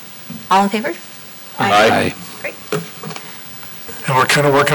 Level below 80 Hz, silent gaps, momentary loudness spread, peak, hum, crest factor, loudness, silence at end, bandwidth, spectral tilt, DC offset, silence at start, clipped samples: -54 dBFS; none; 18 LU; -4 dBFS; none; 12 dB; -16 LUFS; 0 s; over 20 kHz; -4 dB/octave; under 0.1%; 0 s; under 0.1%